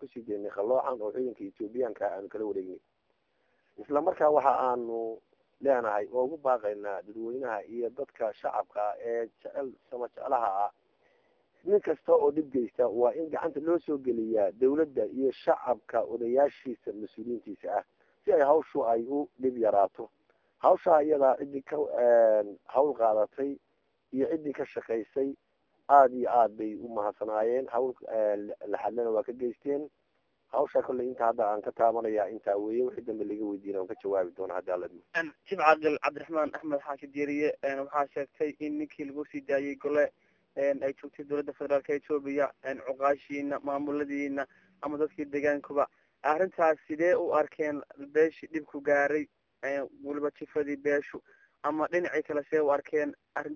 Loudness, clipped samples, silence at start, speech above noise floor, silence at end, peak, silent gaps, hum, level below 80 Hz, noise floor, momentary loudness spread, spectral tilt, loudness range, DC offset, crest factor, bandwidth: -30 LUFS; under 0.1%; 0 s; 46 dB; 0 s; -8 dBFS; none; none; -74 dBFS; -75 dBFS; 12 LU; -7 dB/octave; 6 LU; under 0.1%; 22 dB; 7 kHz